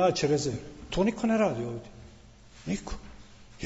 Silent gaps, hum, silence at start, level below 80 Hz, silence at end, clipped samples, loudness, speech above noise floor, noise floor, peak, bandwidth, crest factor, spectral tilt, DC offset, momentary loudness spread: none; none; 0 s; -48 dBFS; 0 s; under 0.1%; -29 LUFS; 24 dB; -52 dBFS; -12 dBFS; 8 kHz; 18 dB; -5.5 dB/octave; under 0.1%; 18 LU